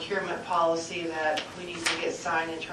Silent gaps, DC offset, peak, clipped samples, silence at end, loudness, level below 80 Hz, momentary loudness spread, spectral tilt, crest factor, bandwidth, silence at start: none; under 0.1%; -12 dBFS; under 0.1%; 0 s; -29 LUFS; -64 dBFS; 6 LU; -2.5 dB/octave; 18 dB; 13 kHz; 0 s